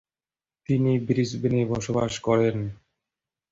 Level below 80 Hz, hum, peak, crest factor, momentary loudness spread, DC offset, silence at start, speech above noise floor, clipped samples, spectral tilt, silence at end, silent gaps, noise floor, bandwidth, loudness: -54 dBFS; none; -10 dBFS; 16 dB; 8 LU; under 0.1%; 0.7 s; over 66 dB; under 0.1%; -7 dB/octave; 0.75 s; none; under -90 dBFS; 7.8 kHz; -25 LUFS